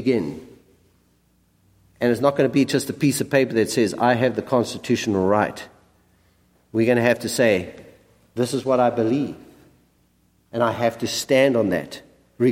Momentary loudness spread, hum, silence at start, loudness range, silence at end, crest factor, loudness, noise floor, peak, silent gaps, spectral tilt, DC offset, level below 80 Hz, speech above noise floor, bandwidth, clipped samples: 13 LU; none; 0 s; 3 LU; 0 s; 18 dB; -21 LUFS; -62 dBFS; -4 dBFS; none; -5 dB/octave; under 0.1%; -60 dBFS; 42 dB; 16.5 kHz; under 0.1%